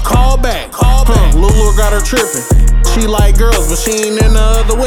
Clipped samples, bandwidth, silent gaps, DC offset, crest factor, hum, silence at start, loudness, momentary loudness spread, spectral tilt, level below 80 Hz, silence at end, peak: under 0.1%; 16.5 kHz; none; under 0.1%; 8 dB; none; 0 s; -12 LUFS; 3 LU; -4.5 dB/octave; -10 dBFS; 0 s; 0 dBFS